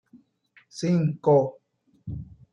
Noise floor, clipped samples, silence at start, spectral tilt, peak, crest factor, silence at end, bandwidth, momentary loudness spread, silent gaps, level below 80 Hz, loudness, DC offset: -61 dBFS; under 0.1%; 0.75 s; -8 dB/octave; -8 dBFS; 18 dB; 0.3 s; 10.5 kHz; 20 LU; none; -56 dBFS; -24 LUFS; under 0.1%